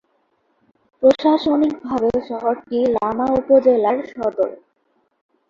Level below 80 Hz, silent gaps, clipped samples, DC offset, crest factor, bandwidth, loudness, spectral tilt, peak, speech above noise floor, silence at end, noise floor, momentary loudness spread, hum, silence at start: -54 dBFS; none; under 0.1%; under 0.1%; 18 dB; 7.2 kHz; -18 LUFS; -7 dB/octave; -2 dBFS; 48 dB; 0.95 s; -66 dBFS; 8 LU; none; 1 s